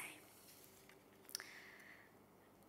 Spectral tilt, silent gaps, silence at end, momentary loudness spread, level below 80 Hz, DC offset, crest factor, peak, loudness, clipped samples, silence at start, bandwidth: -1 dB/octave; none; 0 s; 15 LU; -86 dBFS; under 0.1%; 36 dB; -22 dBFS; -56 LUFS; under 0.1%; 0 s; 16 kHz